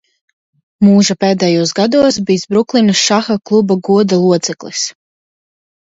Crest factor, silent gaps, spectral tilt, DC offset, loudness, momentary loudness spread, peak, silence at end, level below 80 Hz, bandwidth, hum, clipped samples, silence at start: 14 dB; none; -4.5 dB/octave; under 0.1%; -12 LUFS; 8 LU; 0 dBFS; 1 s; -54 dBFS; 7.8 kHz; none; under 0.1%; 0.8 s